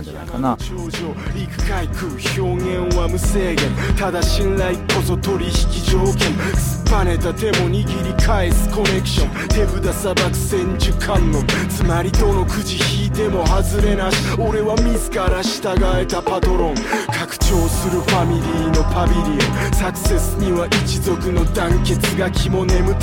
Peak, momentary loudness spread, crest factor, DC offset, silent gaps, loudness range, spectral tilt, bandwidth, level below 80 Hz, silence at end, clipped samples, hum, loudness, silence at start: -4 dBFS; 4 LU; 14 dB; under 0.1%; none; 1 LU; -5 dB/octave; 17 kHz; -22 dBFS; 0 s; under 0.1%; none; -18 LUFS; 0 s